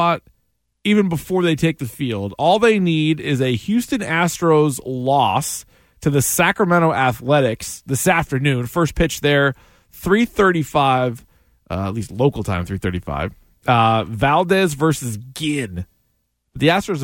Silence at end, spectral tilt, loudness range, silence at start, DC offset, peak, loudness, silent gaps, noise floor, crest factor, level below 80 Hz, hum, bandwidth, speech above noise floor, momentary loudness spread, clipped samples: 0 s; -5 dB/octave; 2 LU; 0 s; under 0.1%; -2 dBFS; -18 LUFS; none; -68 dBFS; 16 dB; -42 dBFS; none; 17 kHz; 50 dB; 10 LU; under 0.1%